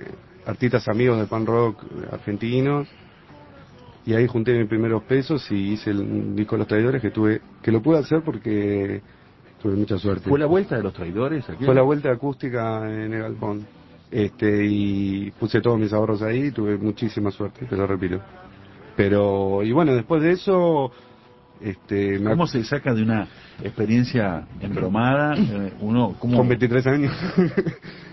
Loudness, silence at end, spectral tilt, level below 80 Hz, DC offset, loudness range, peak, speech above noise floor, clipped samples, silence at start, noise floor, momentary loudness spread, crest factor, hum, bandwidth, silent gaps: -22 LUFS; 0 s; -9 dB/octave; -48 dBFS; under 0.1%; 3 LU; -4 dBFS; 28 dB; under 0.1%; 0 s; -50 dBFS; 11 LU; 18 dB; none; 6 kHz; none